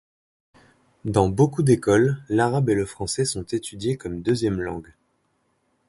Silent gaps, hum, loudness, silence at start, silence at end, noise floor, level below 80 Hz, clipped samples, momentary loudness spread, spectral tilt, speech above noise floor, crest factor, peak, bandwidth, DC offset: none; none; -23 LUFS; 1.05 s; 1.05 s; -69 dBFS; -48 dBFS; under 0.1%; 10 LU; -6 dB/octave; 47 dB; 20 dB; -4 dBFS; 11.5 kHz; under 0.1%